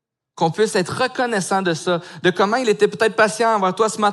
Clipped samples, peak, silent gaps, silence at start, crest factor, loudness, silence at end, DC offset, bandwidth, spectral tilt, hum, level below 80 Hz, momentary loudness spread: under 0.1%; -2 dBFS; none; 0.35 s; 16 dB; -19 LUFS; 0 s; under 0.1%; 12.5 kHz; -4 dB/octave; none; -70 dBFS; 5 LU